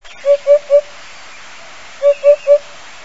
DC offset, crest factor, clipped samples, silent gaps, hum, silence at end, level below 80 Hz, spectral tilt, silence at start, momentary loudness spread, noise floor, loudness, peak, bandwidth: 2%; 14 dB; under 0.1%; none; none; 0.45 s; -58 dBFS; -1.5 dB/octave; 0.25 s; 23 LU; -36 dBFS; -13 LUFS; 0 dBFS; 8 kHz